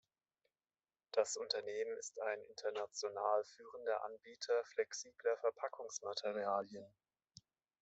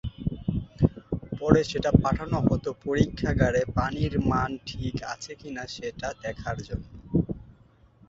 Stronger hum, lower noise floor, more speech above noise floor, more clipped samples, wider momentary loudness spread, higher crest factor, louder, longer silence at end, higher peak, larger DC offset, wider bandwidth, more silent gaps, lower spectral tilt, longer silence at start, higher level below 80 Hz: neither; first, under -90 dBFS vs -57 dBFS; first, over 48 dB vs 31 dB; neither; second, 8 LU vs 13 LU; about the same, 22 dB vs 24 dB; second, -42 LUFS vs -27 LUFS; first, 0.95 s vs 0.6 s; second, -20 dBFS vs -4 dBFS; neither; about the same, 8.2 kHz vs 7.8 kHz; neither; second, -1 dB/octave vs -7 dB/octave; first, 1.15 s vs 0.05 s; second, under -90 dBFS vs -40 dBFS